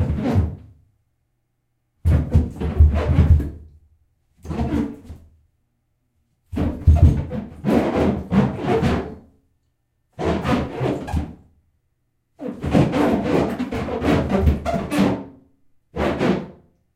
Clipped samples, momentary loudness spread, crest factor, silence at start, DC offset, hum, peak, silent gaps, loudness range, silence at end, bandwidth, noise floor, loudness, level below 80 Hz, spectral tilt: under 0.1%; 14 LU; 18 dB; 0 s; under 0.1%; none; -2 dBFS; none; 6 LU; 0.45 s; 12 kHz; -71 dBFS; -21 LUFS; -28 dBFS; -8 dB/octave